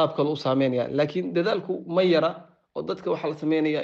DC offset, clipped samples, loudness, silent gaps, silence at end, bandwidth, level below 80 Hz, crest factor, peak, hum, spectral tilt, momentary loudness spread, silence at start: under 0.1%; under 0.1%; -25 LUFS; none; 0 s; 7.4 kHz; -68 dBFS; 14 dB; -10 dBFS; none; -7.5 dB/octave; 10 LU; 0 s